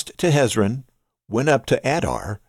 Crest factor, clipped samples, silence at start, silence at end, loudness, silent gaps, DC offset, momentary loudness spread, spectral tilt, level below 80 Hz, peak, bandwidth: 16 dB; under 0.1%; 0 s; 0.1 s; -20 LUFS; none; under 0.1%; 8 LU; -5.5 dB/octave; -46 dBFS; -4 dBFS; 15 kHz